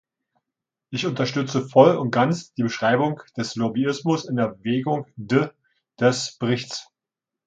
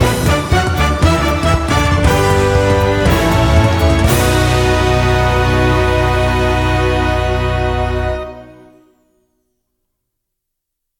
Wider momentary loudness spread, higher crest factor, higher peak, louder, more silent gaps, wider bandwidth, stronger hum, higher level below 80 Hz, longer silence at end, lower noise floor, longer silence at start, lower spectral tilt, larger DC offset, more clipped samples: first, 12 LU vs 4 LU; first, 22 dB vs 14 dB; about the same, -2 dBFS vs 0 dBFS; second, -22 LUFS vs -13 LUFS; neither; second, 9.2 kHz vs 18 kHz; neither; second, -66 dBFS vs -22 dBFS; second, 0.65 s vs 2.5 s; first, -87 dBFS vs -76 dBFS; first, 0.9 s vs 0 s; about the same, -5.5 dB/octave vs -5.5 dB/octave; neither; neither